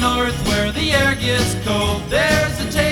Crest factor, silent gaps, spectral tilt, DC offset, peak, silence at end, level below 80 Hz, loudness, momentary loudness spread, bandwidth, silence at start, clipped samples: 16 dB; none; -4 dB/octave; under 0.1%; -2 dBFS; 0 s; -30 dBFS; -17 LUFS; 3 LU; over 20 kHz; 0 s; under 0.1%